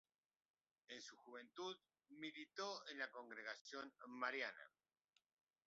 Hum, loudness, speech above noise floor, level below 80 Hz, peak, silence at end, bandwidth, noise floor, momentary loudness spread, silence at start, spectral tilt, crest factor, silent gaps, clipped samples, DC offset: none; -52 LUFS; 34 dB; under -90 dBFS; -30 dBFS; 1 s; 7.6 kHz; -87 dBFS; 13 LU; 0.9 s; 0 dB/octave; 24 dB; 3.61-3.65 s; under 0.1%; under 0.1%